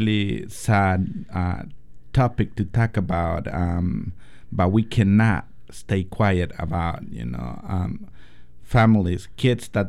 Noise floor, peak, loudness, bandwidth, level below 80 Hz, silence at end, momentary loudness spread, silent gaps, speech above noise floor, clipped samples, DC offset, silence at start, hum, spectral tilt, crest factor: -46 dBFS; -6 dBFS; -23 LUFS; 13 kHz; -38 dBFS; 0 s; 13 LU; none; 25 dB; under 0.1%; 1%; 0 s; none; -7.5 dB/octave; 16 dB